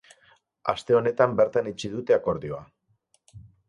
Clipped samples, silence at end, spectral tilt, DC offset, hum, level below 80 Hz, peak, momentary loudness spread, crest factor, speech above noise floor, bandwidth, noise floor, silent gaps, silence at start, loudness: under 0.1%; 0.25 s; -6 dB/octave; under 0.1%; none; -58 dBFS; -4 dBFS; 11 LU; 22 dB; 44 dB; 10.5 kHz; -68 dBFS; none; 0.65 s; -25 LUFS